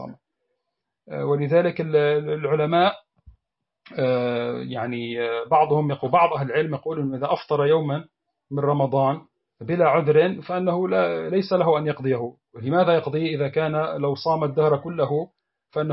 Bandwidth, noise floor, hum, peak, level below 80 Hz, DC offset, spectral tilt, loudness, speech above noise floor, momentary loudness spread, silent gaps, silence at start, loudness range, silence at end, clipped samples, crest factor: 5.8 kHz; -82 dBFS; none; -6 dBFS; -64 dBFS; under 0.1%; -11 dB/octave; -22 LUFS; 60 dB; 9 LU; none; 0 s; 2 LU; 0 s; under 0.1%; 16 dB